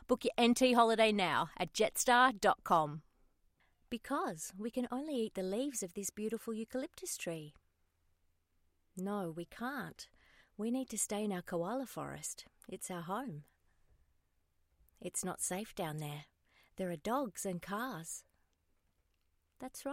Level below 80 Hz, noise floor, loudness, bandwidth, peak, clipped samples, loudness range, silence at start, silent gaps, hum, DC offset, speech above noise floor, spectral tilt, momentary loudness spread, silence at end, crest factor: -70 dBFS; -78 dBFS; -36 LUFS; 16 kHz; -14 dBFS; under 0.1%; 12 LU; 0.1 s; none; none; under 0.1%; 42 dB; -3.5 dB/octave; 18 LU; 0 s; 24 dB